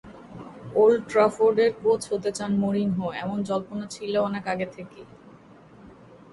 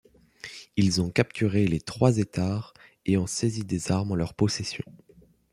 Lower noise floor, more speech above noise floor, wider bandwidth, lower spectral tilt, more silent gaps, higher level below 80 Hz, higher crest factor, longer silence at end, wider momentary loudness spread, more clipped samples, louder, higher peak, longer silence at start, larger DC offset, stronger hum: about the same, -50 dBFS vs -47 dBFS; first, 26 dB vs 21 dB; second, 11.5 kHz vs 13.5 kHz; about the same, -6 dB/octave vs -5.5 dB/octave; neither; second, -62 dBFS vs -54 dBFS; about the same, 18 dB vs 22 dB; second, 0.15 s vs 0.7 s; first, 21 LU vs 15 LU; neither; about the same, -24 LUFS vs -26 LUFS; about the same, -8 dBFS vs -6 dBFS; second, 0.05 s vs 0.45 s; neither; neither